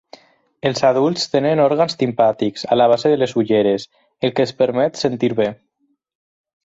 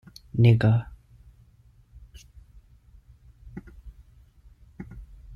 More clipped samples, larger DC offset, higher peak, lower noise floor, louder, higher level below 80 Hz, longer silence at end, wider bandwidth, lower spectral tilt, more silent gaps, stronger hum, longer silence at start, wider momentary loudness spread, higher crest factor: neither; neither; first, -2 dBFS vs -8 dBFS; second, -46 dBFS vs -57 dBFS; first, -17 LUFS vs -22 LUFS; second, -60 dBFS vs -50 dBFS; first, 1.1 s vs 0 s; first, 8 kHz vs 6.4 kHz; second, -5.5 dB/octave vs -8.5 dB/octave; neither; neither; first, 0.65 s vs 0.35 s; second, 7 LU vs 26 LU; about the same, 16 dB vs 20 dB